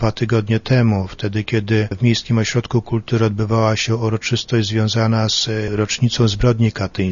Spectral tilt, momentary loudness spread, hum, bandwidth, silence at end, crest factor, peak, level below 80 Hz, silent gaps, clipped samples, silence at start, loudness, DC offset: -5.5 dB/octave; 5 LU; none; 7.4 kHz; 0 s; 14 dB; -2 dBFS; -38 dBFS; none; under 0.1%; 0 s; -18 LUFS; under 0.1%